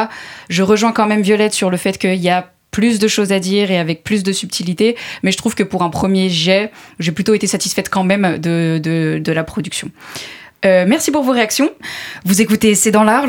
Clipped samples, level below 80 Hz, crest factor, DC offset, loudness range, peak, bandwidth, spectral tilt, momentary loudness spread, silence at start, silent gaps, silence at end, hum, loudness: under 0.1%; -50 dBFS; 14 dB; under 0.1%; 2 LU; 0 dBFS; 18.5 kHz; -4.5 dB/octave; 11 LU; 0 s; none; 0 s; none; -15 LUFS